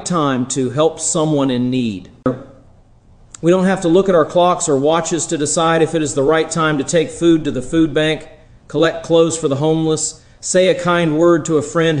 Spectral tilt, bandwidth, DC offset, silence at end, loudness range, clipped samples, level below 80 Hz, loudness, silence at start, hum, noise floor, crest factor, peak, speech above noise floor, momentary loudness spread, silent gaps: -5 dB/octave; 10.5 kHz; under 0.1%; 0 s; 3 LU; under 0.1%; -44 dBFS; -16 LUFS; 0 s; none; -47 dBFS; 14 dB; -2 dBFS; 32 dB; 7 LU; none